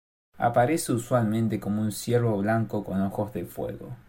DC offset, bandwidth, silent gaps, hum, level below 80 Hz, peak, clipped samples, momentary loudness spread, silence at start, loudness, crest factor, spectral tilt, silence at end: under 0.1%; 16.5 kHz; none; none; -56 dBFS; -10 dBFS; under 0.1%; 10 LU; 0.35 s; -27 LUFS; 16 dB; -6.5 dB/octave; 0.1 s